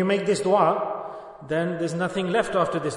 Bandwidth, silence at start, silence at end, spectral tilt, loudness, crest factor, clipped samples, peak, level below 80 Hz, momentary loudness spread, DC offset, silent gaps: 11 kHz; 0 s; 0 s; -5.5 dB/octave; -24 LUFS; 18 dB; under 0.1%; -6 dBFS; -60 dBFS; 12 LU; under 0.1%; none